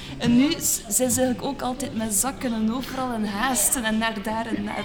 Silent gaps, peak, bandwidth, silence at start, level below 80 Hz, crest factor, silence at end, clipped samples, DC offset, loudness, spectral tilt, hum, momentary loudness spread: none; -6 dBFS; over 20 kHz; 0 s; -46 dBFS; 18 dB; 0 s; under 0.1%; under 0.1%; -23 LUFS; -3 dB/octave; none; 8 LU